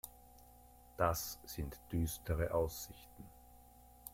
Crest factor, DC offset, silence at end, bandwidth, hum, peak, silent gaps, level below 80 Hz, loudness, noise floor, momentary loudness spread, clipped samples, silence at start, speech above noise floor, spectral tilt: 22 dB; under 0.1%; 0 s; 16.5 kHz; none; -20 dBFS; none; -52 dBFS; -40 LUFS; -61 dBFS; 25 LU; under 0.1%; 0.05 s; 22 dB; -5 dB/octave